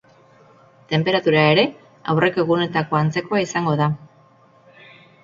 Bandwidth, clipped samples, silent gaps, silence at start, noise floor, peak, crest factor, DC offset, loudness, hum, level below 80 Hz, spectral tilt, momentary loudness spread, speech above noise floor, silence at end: 7.4 kHz; under 0.1%; none; 0.9 s; -53 dBFS; 0 dBFS; 20 dB; under 0.1%; -19 LUFS; none; -58 dBFS; -6 dB/octave; 8 LU; 34 dB; 1.2 s